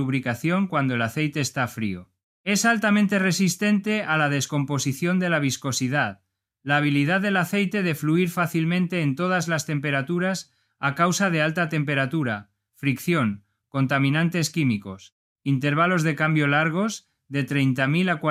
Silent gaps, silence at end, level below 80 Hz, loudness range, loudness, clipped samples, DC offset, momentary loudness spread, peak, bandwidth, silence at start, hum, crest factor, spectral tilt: 2.23-2.44 s, 15.12-15.36 s; 0 s; -66 dBFS; 2 LU; -23 LUFS; under 0.1%; under 0.1%; 8 LU; -6 dBFS; 15.5 kHz; 0 s; none; 18 dB; -5 dB/octave